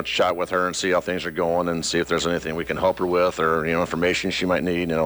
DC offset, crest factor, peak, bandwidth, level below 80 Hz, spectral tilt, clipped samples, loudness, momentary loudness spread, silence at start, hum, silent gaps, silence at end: under 0.1%; 12 dB; -10 dBFS; over 20 kHz; -48 dBFS; -4 dB/octave; under 0.1%; -22 LUFS; 3 LU; 0 s; none; none; 0 s